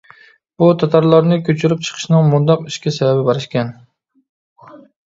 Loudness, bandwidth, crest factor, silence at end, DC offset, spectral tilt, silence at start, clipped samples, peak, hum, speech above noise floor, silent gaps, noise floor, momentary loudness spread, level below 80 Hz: -15 LUFS; 7.8 kHz; 16 dB; 0.3 s; under 0.1%; -7 dB/octave; 0.6 s; under 0.1%; 0 dBFS; none; 33 dB; 4.29-4.56 s; -47 dBFS; 10 LU; -58 dBFS